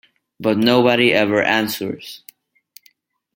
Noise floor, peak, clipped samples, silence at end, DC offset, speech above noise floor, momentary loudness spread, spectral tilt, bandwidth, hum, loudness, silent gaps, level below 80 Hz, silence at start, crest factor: -58 dBFS; -2 dBFS; under 0.1%; 1.2 s; under 0.1%; 41 dB; 18 LU; -5 dB/octave; 17 kHz; none; -16 LUFS; none; -62 dBFS; 0.4 s; 18 dB